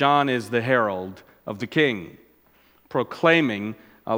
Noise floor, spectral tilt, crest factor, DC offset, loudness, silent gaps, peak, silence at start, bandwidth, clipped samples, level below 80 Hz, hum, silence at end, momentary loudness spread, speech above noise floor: -59 dBFS; -6 dB/octave; 22 dB; under 0.1%; -23 LUFS; none; -2 dBFS; 0 s; 16.5 kHz; under 0.1%; -68 dBFS; none; 0 s; 19 LU; 36 dB